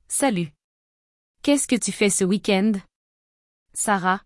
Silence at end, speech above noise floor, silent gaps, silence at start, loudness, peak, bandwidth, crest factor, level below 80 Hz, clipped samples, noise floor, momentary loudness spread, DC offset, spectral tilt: 0.05 s; over 69 dB; 0.64-1.34 s, 2.96-3.66 s; 0.1 s; -22 LUFS; -8 dBFS; 12 kHz; 16 dB; -60 dBFS; under 0.1%; under -90 dBFS; 9 LU; under 0.1%; -4 dB/octave